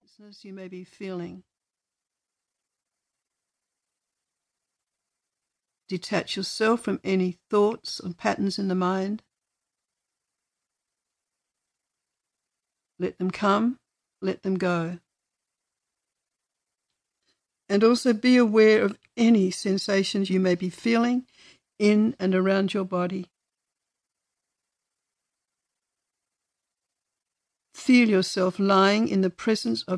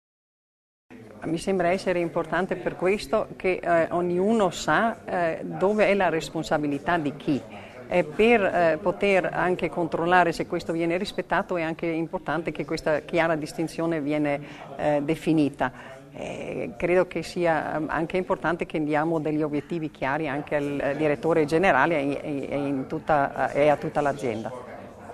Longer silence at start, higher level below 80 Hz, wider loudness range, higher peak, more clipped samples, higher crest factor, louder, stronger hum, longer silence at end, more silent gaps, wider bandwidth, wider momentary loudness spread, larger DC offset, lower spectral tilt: second, 0.45 s vs 0.9 s; second, -72 dBFS vs -52 dBFS; first, 16 LU vs 3 LU; second, -8 dBFS vs -4 dBFS; neither; about the same, 20 dB vs 22 dB; about the same, -24 LUFS vs -25 LUFS; neither; about the same, 0 s vs 0 s; neither; second, 11 kHz vs 13.5 kHz; first, 16 LU vs 9 LU; neither; about the same, -5.5 dB/octave vs -6 dB/octave